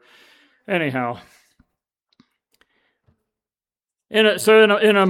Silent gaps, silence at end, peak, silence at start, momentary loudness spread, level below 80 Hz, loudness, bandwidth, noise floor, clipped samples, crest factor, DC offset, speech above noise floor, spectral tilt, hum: none; 0 s; -2 dBFS; 0.7 s; 14 LU; -72 dBFS; -17 LUFS; 16 kHz; under -90 dBFS; under 0.1%; 20 dB; under 0.1%; over 74 dB; -4.5 dB/octave; none